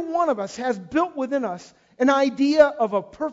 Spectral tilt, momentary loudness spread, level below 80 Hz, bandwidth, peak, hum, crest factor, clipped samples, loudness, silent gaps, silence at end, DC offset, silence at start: -5 dB/octave; 9 LU; -60 dBFS; 7.8 kHz; -2 dBFS; none; 20 dB; under 0.1%; -22 LUFS; none; 0 s; under 0.1%; 0 s